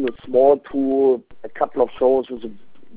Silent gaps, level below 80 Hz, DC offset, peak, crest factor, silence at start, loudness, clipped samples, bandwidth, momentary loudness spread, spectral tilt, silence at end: none; -54 dBFS; 1%; -4 dBFS; 16 dB; 0 s; -19 LUFS; under 0.1%; 4 kHz; 17 LU; -10 dB/octave; 0.45 s